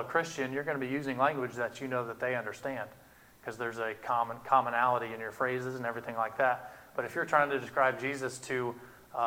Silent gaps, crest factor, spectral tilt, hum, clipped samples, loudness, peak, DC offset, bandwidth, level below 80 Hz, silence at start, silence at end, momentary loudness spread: none; 22 dB; -5 dB/octave; none; under 0.1%; -32 LUFS; -10 dBFS; under 0.1%; 18.5 kHz; -72 dBFS; 0 s; 0 s; 11 LU